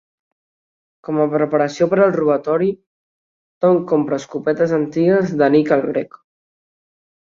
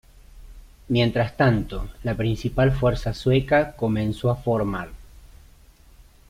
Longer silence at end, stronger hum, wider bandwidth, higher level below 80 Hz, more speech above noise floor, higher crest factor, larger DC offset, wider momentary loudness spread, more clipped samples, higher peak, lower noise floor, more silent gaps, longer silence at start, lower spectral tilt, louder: first, 1.15 s vs 0.95 s; neither; second, 7.6 kHz vs 14.5 kHz; second, -62 dBFS vs -38 dBFS; first, over 74 dB vs 29 dB; about the same, 16 dB vs 18 dB; neither; about the same, 8 LU vs 9 LU; neither; first, -2 dBFS vs -6 dBFS; first, under -90 dBFS vs -51 dBFS; first, 2.86-3.61 s vs none; first, 1.1 s vs 0.35 s; about the same, -7.5 dB/octave vs -7.5 dB/octave; first, -17 LUFS vs -23 LUFS